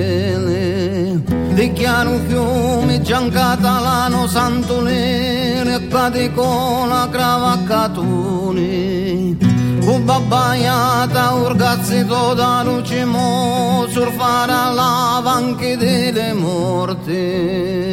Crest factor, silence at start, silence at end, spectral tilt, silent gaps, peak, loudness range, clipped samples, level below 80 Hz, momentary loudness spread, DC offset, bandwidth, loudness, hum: 14 dB; 0 s; 0 s; -5.5 dB/octave; none; -2 dBFS; 2 LU; under 0.1%; -38 dBFS; 4 LU; under 0.1%; 16.5 kHz; -16 LUFS; none